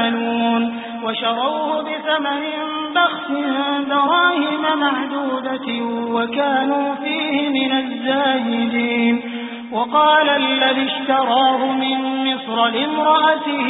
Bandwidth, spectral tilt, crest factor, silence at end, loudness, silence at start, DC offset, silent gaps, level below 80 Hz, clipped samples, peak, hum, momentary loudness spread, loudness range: 4 kHz; -9 dB/octave; 14 dB; 0 s; -18 LUFS; 0 s; under 0.1%; none; -68 dBFS; under 0.1%; -4 dBFS; none; 8 LU; 3 LU